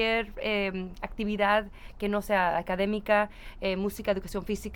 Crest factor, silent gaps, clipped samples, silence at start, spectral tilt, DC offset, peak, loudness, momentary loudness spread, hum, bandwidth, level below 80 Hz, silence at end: 18 dB; none; under 0.1%; 0 s; -5.5 dB/octave; under 0.1%; -10 dBFS; -29 LUFS; 9 LU; none; 19.5 kHz; -46 dBFS; 0 s